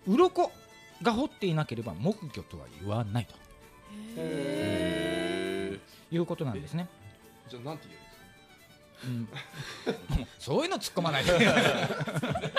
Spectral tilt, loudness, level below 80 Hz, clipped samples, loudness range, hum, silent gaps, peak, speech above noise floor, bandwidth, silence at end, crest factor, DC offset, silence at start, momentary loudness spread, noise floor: -5.5 dB/octave; -30 LUFS; -50 dBFS; under 0.1%; 11 LU; none; none; -8 dBFS; 26 dB; 15.5 kHz; 0 s; 22 dB; under 0.1%; 0.05 s; 19 LU; -56 dBFS